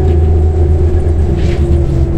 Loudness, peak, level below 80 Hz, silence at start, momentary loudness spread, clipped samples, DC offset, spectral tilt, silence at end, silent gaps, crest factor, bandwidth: -12 LUFS; 0 dBFS; -12 dBFS; 0 s; 2 LU; under 0.1%; under 0.1%; -9.5 dB/octave; 0 s; none; 8 dB; 5.2 kHz